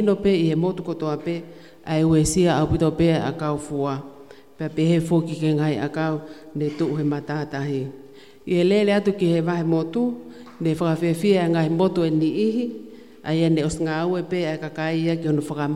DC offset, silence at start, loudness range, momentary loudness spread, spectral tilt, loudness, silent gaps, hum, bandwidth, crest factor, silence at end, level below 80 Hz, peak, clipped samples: 0.3%; 0 s; 3 LU; 11 LU; -6.5 dB/octave; -22 LUFS; none; none; 12.5 kHz; 16 dB; 0 s; -46 dBFS; -6 dBFS; under 0.1%